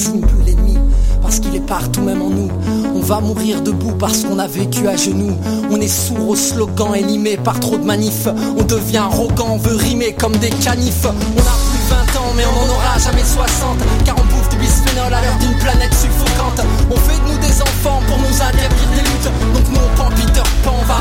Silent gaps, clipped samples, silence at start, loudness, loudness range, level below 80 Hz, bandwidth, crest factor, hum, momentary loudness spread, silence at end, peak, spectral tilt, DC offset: none; under 0.1%; 0 s; -15 LUFS; 2 LU; -16 dBFS; 16.5 kHz; 12 dB; none; 3 LU; 0 s; 0 dBFS; -4.5 dB/octave; under 0.1%